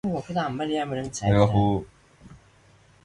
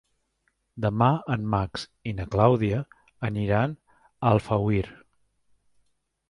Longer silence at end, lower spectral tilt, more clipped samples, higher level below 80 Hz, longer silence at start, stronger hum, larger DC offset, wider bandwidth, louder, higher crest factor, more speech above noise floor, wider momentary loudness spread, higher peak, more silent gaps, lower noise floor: second, 0.7 s vs 1.35 s; second, -6.5 dB/octave vs -8 dB/octave; neither; about the same, -46 dBFS vs -48 dBFS; second, 0.05 s vs 0.75 s; neither; neither; about the same, 11 kHz vs 11 kHz; about the same, -25 LUFS vs -26 LUFS; second, 18 dB vs 24 dB; second, 33 dB vs 49 dB; second, 9 LU vs 13 LU; second, -8 dBFS vs -4 dBFS; neither; second, -56 dBFS vs -74 dBFS